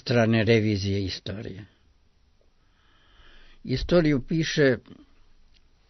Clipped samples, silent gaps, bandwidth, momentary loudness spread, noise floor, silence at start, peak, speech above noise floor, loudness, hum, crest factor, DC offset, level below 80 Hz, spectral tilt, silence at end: under 0.1%; none; 6.2 kHz; 16 LU; -61 dBFS; 0.05 s; -8 dBFS; 37 dB; -24 LUFS; none; 18 dB; under 0.1%; -46 dBFS; -6.5 dB/octave; 0.95 s